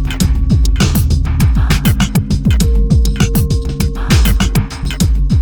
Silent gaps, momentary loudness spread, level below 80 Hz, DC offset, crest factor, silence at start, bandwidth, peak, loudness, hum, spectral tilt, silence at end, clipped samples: none; 4 LU; -14 dBFS; under 0.1%; 10 dB; 0 s; over 20 kHz; 0 dBFS; -13 LUFS; none; -5.5 dB/octave; 0 s; under 0.1%